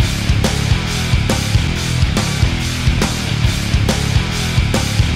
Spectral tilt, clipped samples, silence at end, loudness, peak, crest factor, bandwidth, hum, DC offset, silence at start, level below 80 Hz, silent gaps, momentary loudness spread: -4.5 dB/octave; under 0.1%; 0 s; -16 LUFS; -2 dBFS; 12 dB; 16 kHz; none; under 0.1%; 0 s; -22 dBFS; none; 1 LU